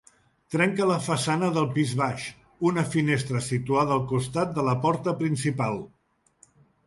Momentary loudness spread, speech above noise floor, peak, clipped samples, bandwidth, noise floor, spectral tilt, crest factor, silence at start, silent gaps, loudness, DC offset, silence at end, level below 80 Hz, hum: 6 LU; 36 dB; -10 dBFS; under 0.1%; 11.5 kHz; -61 dBFS; -6 dB/octave; 16 dB; 0.5 s; none; -26 LUFS; under 0.1%; 1 s; -60 dBFS; none